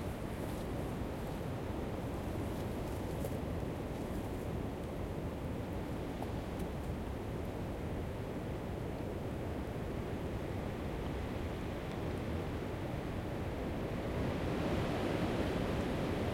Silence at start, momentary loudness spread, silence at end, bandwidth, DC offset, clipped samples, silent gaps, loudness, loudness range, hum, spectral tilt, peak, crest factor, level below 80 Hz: 0 s; 5 LU; 0 s; 16.5 kHz; under 0.1%; under 0.1%; none; -40 LUFS; 4 LU; none; -7 dB/octave; -22 dBFS; 16 dB; -48 dBFS